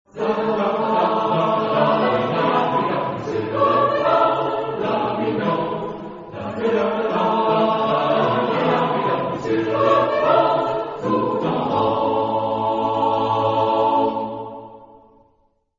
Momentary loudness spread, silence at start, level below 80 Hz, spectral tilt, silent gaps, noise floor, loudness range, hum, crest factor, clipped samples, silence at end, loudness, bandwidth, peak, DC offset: 7 LU; 0.15 s; -58 dBFS; -7.5 dB/octave; none; -63 dBFS; 3 LU; none; 16 dB; under 0.1%; 0.9 s; -20 LUFS; 7.6 kHz; -4 dBFS; under 0.1%